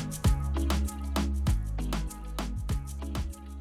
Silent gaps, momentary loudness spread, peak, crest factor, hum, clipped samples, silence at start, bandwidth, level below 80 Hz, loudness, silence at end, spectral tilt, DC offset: none; 8 LU; -16 dBFS; 14 dB; none; under 0.1%; 0 s; 15.5 kHz; -32 dBFS; -32 LUFS; 0 s; -5.5 dB/octave; under 0.1%